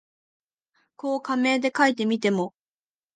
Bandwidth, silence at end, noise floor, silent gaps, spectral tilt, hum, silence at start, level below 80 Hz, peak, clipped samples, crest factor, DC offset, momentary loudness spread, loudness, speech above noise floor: 9.6 kHz; 0.65 s; under -90 dBFS; none; -5 dB/octave; none; 1.05 s; -76 dBFS; -6 dBFS; under 0.1%; 20 dB; under 0.1%; 10 LU; -24 LUFS; over 67 dB